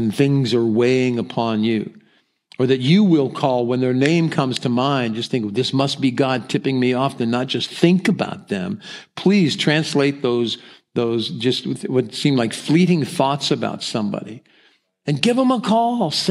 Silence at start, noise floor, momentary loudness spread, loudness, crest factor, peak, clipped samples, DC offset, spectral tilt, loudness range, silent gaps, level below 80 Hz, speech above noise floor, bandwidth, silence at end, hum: 0 s; -59 dBFS; 8 LU; -19 LUFS; 18 dB; 0 dBFS; under 0.1%; under 0.1%; -6 dB/octave; 2 LU; none; -68 dBFS; 41 dB; 12.5 kHz; 0 s; none